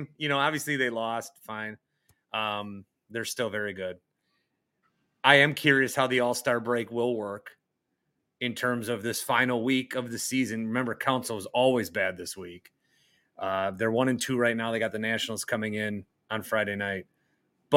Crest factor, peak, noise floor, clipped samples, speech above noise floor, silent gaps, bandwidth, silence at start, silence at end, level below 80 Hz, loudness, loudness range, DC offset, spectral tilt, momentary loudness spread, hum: 28 dB; -2 dBFS; -80 dBFS; under 0.1%; 52 dB; none; 17 kHz; 0 s; 0 s; -74 dBFS; -28 LUFS; 8 LU; under 0.1%; -4 dB/octave; 13 LU; none